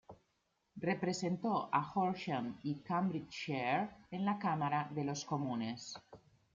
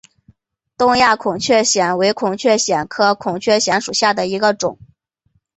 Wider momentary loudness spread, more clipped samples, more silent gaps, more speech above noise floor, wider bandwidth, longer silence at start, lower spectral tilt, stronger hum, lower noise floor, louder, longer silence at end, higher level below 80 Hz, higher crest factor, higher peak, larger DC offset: first, 8 LU vs 5 LU; neither; neither; second, 44 dB vs 48 dB; about the same, 7.8 kHz vs 8.4 kHz; second, 0.1 s vs 0.8 s; first, -5.5 dB/octave vs -2.5 dB/octave; neither; first, -81 dBFS vs -64 dBFS; second, -38 LUFS vs -16 LUFS; second, 0.4 s vs 0.85 s; second, -76 dBFS vs -54 dBFS; about the same, 20 dB vs 16 dB; second, -18 dBFS vs -2 dBFS; neither